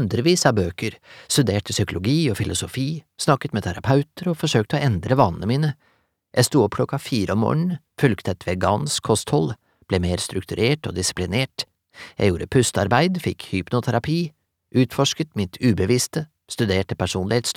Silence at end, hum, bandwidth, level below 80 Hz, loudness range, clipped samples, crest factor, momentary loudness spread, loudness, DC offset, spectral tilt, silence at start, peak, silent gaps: 0.05 s; none; 16.5 kHz; -48 dBFS; 1 LU; under 0.1%; 20 dB; 8 LU; -22 LUFS; under 0.1%; -5 dB/octave; 0 s; -2 dBFS; none